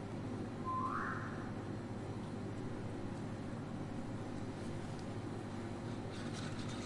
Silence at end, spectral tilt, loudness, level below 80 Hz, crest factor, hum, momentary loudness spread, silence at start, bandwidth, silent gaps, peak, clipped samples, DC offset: 0 s; -6.5 dB/octave; -44 LUFS; -60 dBFS; 16 dB; 50 Hz at -50 dBFS; 5 LU; 0 s; 11.5 kHz; none; -28 dBFS; under 0.1%; under 0.1%